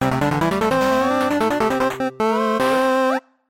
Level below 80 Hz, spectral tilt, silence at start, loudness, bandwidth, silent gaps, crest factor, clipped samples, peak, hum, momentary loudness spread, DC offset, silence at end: -46 dBFS; -5.5 dB/octave; 0 s; -19 LUFS; 17 kHz; none; 12 dB; under 0.1%; -6 dBFS; none; 3 LU; under 0.1%; 0.3 s